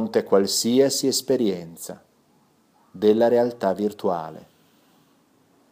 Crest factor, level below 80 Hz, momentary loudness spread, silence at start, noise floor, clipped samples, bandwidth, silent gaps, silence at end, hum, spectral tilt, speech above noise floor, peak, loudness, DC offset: 18 dB; -70 dBFS; 16 LU; 0 s; -61 dBFS; under 0.1%; 15.5 kHz; none; 1.3 s; none; -4 dB/octave; 40 dB; -6 dBFS; -21 LUFS; under 0.1%